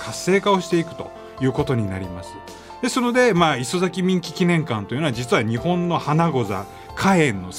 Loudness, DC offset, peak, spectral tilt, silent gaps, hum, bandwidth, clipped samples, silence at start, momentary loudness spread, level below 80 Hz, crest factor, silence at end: -21 LUFS; under 0.1%; -2 dBFS; -5.5 dB/octave; none; none; 16 kHz; under 0.1%; 0 s; 15 LU; -50 dBFS; 18 dB; 0 s